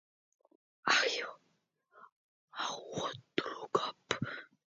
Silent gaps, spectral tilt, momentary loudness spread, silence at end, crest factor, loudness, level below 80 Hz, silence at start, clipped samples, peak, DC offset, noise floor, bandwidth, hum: 2.12-2.48 s; -1 dB/octave; 12 LU; 0.2 s; 26 dB; -35 LUFS; -76 dBFS; 0.85 s; under 0.1%; -12 dBFS; under 0.1%; -78 dBFS; 7.6 kHz; none